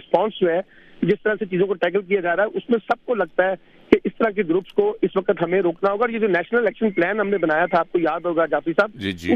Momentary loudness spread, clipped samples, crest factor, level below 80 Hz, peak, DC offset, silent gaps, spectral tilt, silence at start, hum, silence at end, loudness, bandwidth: 3 LU; under 0.1%; 20 dB; -56 dBFS; 0 dBFS; under 0.1%; none; -7.5 dB/octave; 0.1 s; none; 0 s; -21 LUFS; 7.6 kHz